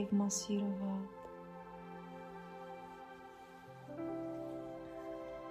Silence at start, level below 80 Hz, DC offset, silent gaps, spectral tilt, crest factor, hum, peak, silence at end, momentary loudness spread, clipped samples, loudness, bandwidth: 0 s; -72 dBFS; under 0.1%; none; -5 dB/octave; 18 dB; none; -24 dBFS; 0 s; 17 LU; under 0.1%; -43 LUFS; 14 kHz